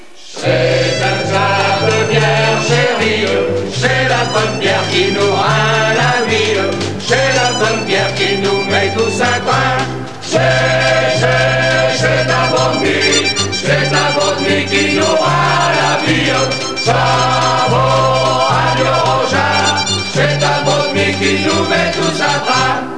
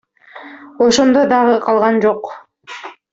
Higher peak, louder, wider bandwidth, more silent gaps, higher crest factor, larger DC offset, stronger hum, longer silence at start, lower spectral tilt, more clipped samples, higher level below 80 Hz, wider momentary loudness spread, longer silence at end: about the same, 0 dBFS vs 0 dBFS; about the same, -12 LUFS vs -13 LUFS; first, 11 kHz vs 8 kHz; neither; about the same, 12 dB vs 14 dB; first, 2% vs under 0.1%; neither; second, 0.2 s vs 0.35 s; about the same, -4 dB/octave vs -4 dB/octave; neither; first, -42 dBFS vs -56 dBFS; second, 3 LU vs 21 LU; second, 0 s vs 0.2 s